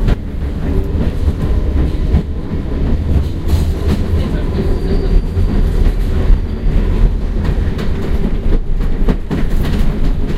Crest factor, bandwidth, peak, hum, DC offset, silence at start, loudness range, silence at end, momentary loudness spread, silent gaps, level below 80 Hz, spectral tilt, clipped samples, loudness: 12 dB; 8 kHz; 0 dBFS; none; under 0.1%; 0 s; 1 LU; 0 s; 3 LU; none; -14 dBFS; -8 dB/octave; under 0.1%; -17 LUFS